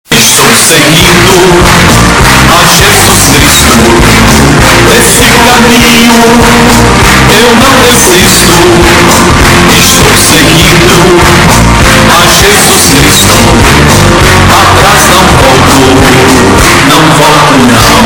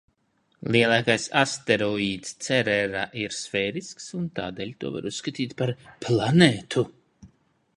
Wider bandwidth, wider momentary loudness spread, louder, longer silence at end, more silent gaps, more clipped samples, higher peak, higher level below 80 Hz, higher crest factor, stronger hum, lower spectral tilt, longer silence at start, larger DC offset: first, over 20 kHz vs 11.5 kHz; second, 1 LU vs 13 LU; first, -1 LUFS vs -24 LUFS; second, 0 s vs 0.5 s; neither; first, 20% vs under 0.1%; about the same, 0 dBFS vs -2 dBFS; first, -14 dBFS vs -58 dBFS; second, 2 dB vs 24 dB; neither; about the same, -3.5 dB/octave vs -4.5 dB/octave; second, 0.1 s vs 0.65 s; first, 0.9% vs under 0.1%